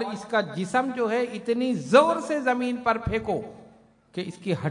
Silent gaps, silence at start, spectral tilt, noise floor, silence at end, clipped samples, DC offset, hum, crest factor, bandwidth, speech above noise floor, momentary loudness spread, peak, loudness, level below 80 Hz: none; 0 s; -6 dB/octave; -55 dBFS; 0 s; under 0.1%; under 0.1%; none; 22 dB; 11 kHz; 30 dB; 14 LU; -4 dBFS; -25 LUFS; -52 dBFS